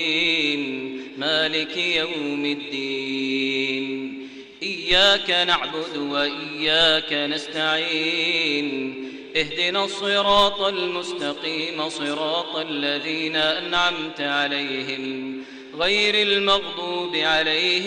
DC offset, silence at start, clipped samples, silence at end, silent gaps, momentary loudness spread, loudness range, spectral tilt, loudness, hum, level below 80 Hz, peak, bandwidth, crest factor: under 0.1%; 0 s; under 0.1%; 0 s; none; 11 LU; 4 LU; -3 dB/octave; -21 LUFS; none; -54 dBFS; -6 dBFS; 11 kHz; 18 dB